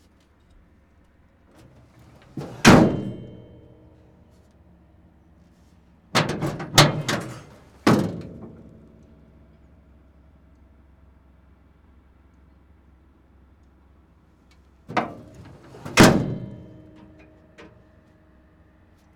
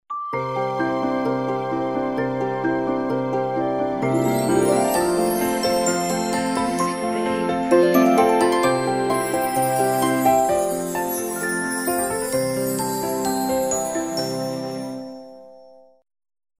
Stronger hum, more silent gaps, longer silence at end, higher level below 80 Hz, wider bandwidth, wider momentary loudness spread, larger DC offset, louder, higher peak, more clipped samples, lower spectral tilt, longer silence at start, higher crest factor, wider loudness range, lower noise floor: neither; neither; first, 2.6 s vs 0.95 s; first, -48 dBFS vs -54 dBFS; first, over 20 kHz vs 16 kHz; first, 28 LU vs 7 LU; neither; about the same, -20 LUFS vs -21 LUFS; first, 0 dBFS vs -4 dBFS; neither; about the same, -4.5 dB/octave vs -4.5 dB/octave; first, 2.35 s vs 0.1 s; first, 26 dB vs 18 dB; first, 14 LU vs 5 LU; first, -57 dBFS vs -48 dBFS